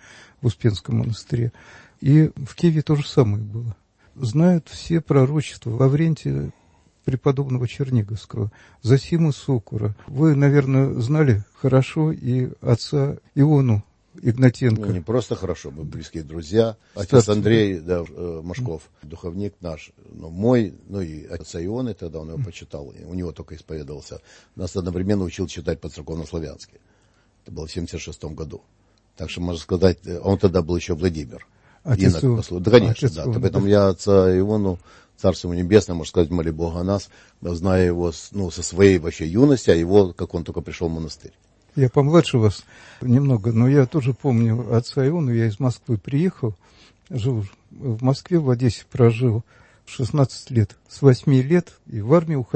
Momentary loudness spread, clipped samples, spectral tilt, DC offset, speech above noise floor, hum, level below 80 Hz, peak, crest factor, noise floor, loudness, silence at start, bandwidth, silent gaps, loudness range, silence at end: 16 LU; under 0.1%; -7.5 dB/octave; under 0.1%; 39 dB; none; -44 dBFS; 0 dBFS; 20 dB; -59 dBFS; -21 LUFS; 0.4 s; 8.6 kHz; none; 9 LU; 0.1 s